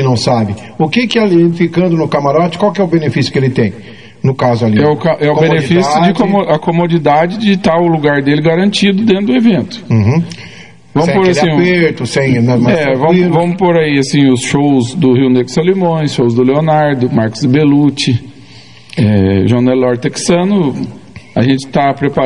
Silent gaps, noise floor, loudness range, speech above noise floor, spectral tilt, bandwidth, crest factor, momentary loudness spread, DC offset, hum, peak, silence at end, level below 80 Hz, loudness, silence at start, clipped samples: none; -37 dBFS; 2 LU; 27 dB; -6.5 dB/octave; 11 kHz; 10 dB; 5 LU; 0.9%; none; 0 dBFS; 0 s; -46 dBFS; -11 LUFS; 0 s; under 0.1%